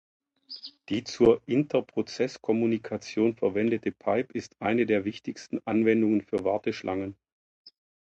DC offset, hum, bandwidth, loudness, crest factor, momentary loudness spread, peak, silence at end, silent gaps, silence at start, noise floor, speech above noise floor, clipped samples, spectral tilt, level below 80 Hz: under 0.1%; none; 8 kHz; -27 LUFS; 20 dB; 12 LU; -8 dBFS; 0.3 s; 7.32-7.64 s; 0.5 s; -46 dBFS; 19 dB; under 0.1%; -6.5 dB/octave; -62 dBFS